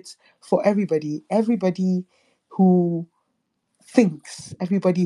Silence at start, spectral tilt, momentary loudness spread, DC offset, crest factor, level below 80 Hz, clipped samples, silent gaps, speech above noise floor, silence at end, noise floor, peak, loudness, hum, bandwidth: 0.05 s; -8 dB/octave; 14 LU; under 0.1%; 20 dB; -74 dBFS; under 0.1%; none; 53 dB; 0 s; -74 dBFS; -2 dBFS; -22 LUFS; none; 11 kHz